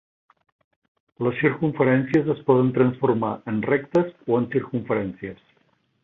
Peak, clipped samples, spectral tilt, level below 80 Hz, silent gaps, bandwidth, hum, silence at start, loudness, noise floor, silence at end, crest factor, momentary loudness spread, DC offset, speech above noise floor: -4 dBFS; under 0.1%; -9.5 dB/octave; -60 dBFS; none; 6.8 kHz; none; 1.2 s; -22 LUFS; -65 dBFS; 0.7 s; 18 dB; 7 LU; under 0.1%; 44 dB